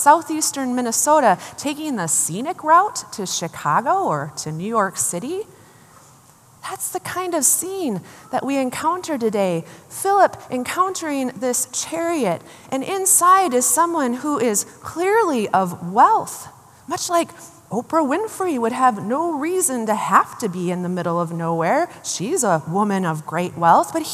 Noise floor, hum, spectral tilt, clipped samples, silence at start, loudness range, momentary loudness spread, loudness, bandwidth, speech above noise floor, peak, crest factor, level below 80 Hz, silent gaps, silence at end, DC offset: -50 dBFS; none; -3.5 dB/octave; under 0.1%; 0 s; 5 LU; 12 LU; -19 LUFS; 15 kHz; 30 dB; 0 dBFS; 20 dB; -68 dBFS; none; 0 s; under 0.1%